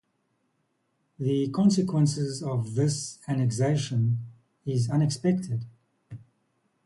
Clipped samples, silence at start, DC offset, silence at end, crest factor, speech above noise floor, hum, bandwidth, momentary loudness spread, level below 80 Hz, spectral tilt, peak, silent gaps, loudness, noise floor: under 0.1%; 1.2 s; under 0.1%; 0.65 s; 16 dB; 49 dB; none; 11.5 kHz; 22 LU; -62 dBFS; -6.5 dB/octave; -12 dBFS; none; -27 LUFS; -74 dBFS